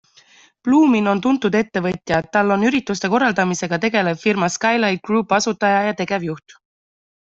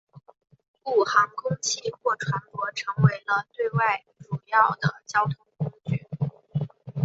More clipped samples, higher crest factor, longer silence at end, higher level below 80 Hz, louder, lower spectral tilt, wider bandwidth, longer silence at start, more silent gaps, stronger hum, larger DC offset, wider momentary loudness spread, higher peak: neither; second, 16 dB vs 22 dB; first, 0.9 s vs 0 s; first, -56 dBFS vs -64 dBFS; first, -18 LUFS vs -26 LUFS; about the same, -5 dB/octave vs -5 dB/octave; about the same, 8 kHz vs 8 kHz; first, 0.65 s vs 0.15 s; second, none vs 0.68-0.74 s; neither; neither; second, 7 LU vs 11 LU; about the same, -2 dBFS vs -4 dBFS